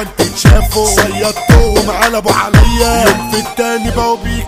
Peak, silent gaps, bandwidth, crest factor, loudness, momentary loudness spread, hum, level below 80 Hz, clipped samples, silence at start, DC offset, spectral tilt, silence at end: 0 dBFS; none; 16.5 kHz; 10 dB; -11 LUFS; 6 LU; none; -16 dBFS; 1%; 0 s; under 0.1%; -4.5 dB/octave; 0 s